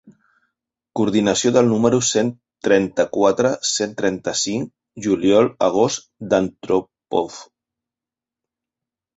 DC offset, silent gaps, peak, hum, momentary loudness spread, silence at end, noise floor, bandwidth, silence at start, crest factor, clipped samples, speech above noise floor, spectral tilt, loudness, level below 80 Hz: under 0.1%; none; -2 dBFS; none; 11 LU; 1.75 s; -89 dBFS; 8.2 kHz; 0.95 s; 18 dB; under 0.1%; 70 dB; -4 dB/octave; -19 LUFS; -56 dBFS